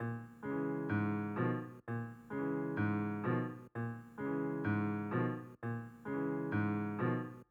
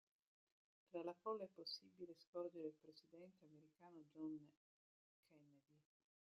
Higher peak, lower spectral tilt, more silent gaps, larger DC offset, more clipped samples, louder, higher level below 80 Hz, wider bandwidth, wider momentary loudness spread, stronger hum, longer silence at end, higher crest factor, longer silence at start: first, -24 dBFS vs -36 dBFS; first, -10 dB/octave vs -4 dB/octave; second, none vs 2.27-2.33 s, 4.57-5.23 s; neither; neither; first, -39 LUFS vs -54 LUFS; first, -74 dBFS vs under -90 dBFS; about the same, 7 kHz vs 7.2 kHz; second, 7 LU vs 16 LU; neither; second, 0.05 s vs 0.6 s; second, 14 dB vs 22 dB; second, 0 s vs 0.9 s